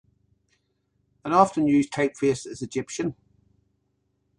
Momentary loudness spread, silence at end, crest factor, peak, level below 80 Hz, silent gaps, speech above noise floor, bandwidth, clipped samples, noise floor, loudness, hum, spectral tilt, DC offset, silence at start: 12 LU; 1.25 s; 24 dB; -4 dBFS; -62 dBFS; none; 49 dB; 11 kHz; under 0.1%; -73 dBFS; -24 LUFS; 50 Hz at -55 dBFS; -5.5 dB/octave; under 0.1%; 1.25 s